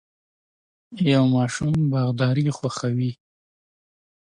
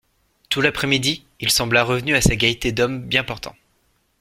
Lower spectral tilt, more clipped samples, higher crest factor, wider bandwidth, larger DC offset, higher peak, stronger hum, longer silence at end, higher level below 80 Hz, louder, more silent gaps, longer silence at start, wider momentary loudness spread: first, -6.5 dB/octave vs -3.5 dB/octave; neither; about the same, 16 dB vs 20 dB; second, 10.5 kHz vs 16.5 kHz; neither; second, -8 dBFS vs -2 dBFS; neither; first, 1.15 s vs 0.7 s; second, -56 dBFS vs -38 dBFS; second, -22 LUFS vs -19 LUFS; neither; first, 0.9 s vs 0.5 s; about the same, 7 LU vs 8 LU